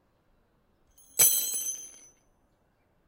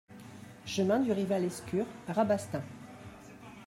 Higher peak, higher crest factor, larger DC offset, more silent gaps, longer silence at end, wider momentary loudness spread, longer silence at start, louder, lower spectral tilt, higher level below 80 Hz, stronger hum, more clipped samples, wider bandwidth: first, -6 dBFS vs -16 dBFS; first, 26 dB vs 18 dB; neither; neither; first, 1.2 s vs 0 s; about the same, 19 LU vs 21 LU; first, 1.15 s vs 0.1 s; first, -24 LUFS vs -32 LUFS; second, 1.5 dB/octave vs -6 dB/octave; about the same, -72 dBFS vs -68 dBFS; neither; neither; about the same, 16 kHz vs 16 kHz